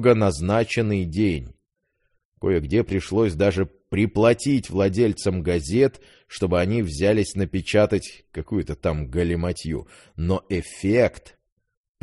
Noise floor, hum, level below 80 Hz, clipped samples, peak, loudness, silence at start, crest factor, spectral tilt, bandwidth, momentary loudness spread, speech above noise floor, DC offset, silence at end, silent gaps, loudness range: -73 dBFS; none; -40 dBFS; under 0.1%; -2 dBFS; -23 LUFS; 0 s; 20 dB; -6.5 dB/octave; 11.5 kHz; 9 LU; 51 dB; under 0.1%; 0.85 s; 2.25-2.32 s; 4 LU